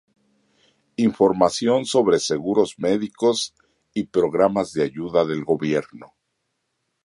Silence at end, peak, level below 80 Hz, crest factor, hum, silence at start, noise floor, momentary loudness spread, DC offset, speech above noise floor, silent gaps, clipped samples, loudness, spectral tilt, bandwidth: 1 s; -2 dBFS; -58 dBFS; 20 dB; none; 1 s; -75 dBFS; 7 LU; under 0.1%; 55 dB; none; under 0.1%; -21 LUFS; -5 dB/octave; 11.5 kHz